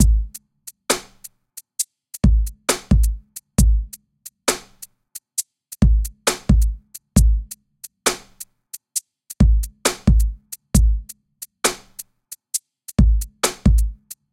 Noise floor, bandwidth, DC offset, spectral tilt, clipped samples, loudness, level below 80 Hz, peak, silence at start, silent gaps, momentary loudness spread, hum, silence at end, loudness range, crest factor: -46 dBFS; 16.5 kHz; under 0.1%; -4.5 dB/octave; under 0.1%; -21 LUFS; -22 dBFS; 0 dBFS; 0 s; none; 21 LU; none; 0.2 s; 2 LU; 20 dB